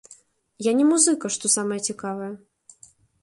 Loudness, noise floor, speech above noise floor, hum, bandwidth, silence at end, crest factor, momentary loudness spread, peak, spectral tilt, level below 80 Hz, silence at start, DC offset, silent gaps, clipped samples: -22 LUFS; -55 dBFS; 32 dB; none; 11.5 kHz; 0.85 s; 20 dB; 16 LU; -4 dBFS; -3 dB/octave; -72 dBFS; 0.6 s; under 0.1%; none; under 0.1%